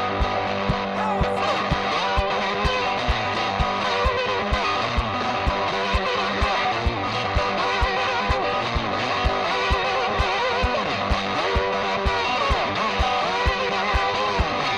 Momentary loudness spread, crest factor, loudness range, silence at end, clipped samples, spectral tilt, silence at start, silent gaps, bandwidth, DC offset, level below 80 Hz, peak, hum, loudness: 2 LU; 12 dB; 1 LU; 0 s; under 0.1%; -4.5 dB/octave; 0 s; none; 10.5 kHz; under 0.1%; -32 dBFS; -10 dBFS; none; -22 LUFS